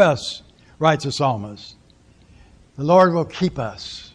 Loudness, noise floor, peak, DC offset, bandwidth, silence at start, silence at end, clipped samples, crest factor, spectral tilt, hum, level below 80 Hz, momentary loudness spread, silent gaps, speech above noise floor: -20 LUFS; -52 dBFS; -2 dBFS; under 0.1%; 10.5 kHz; 0 s; 0.1 s; under 0.1%; 18 dB; -6 dB/octave; none; -52 dBFS; 21 LU; none; 33 dB